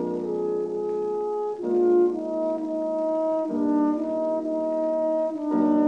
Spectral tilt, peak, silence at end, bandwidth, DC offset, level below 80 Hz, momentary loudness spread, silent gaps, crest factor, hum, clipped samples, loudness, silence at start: -9 dB/octave; -10 dBFS; 0 s; 7.2 kHz; under 0.1%; -78 dBFS; 6 LU; none; 14 dB; none; under 0.1%; -25 LUFS; 0 s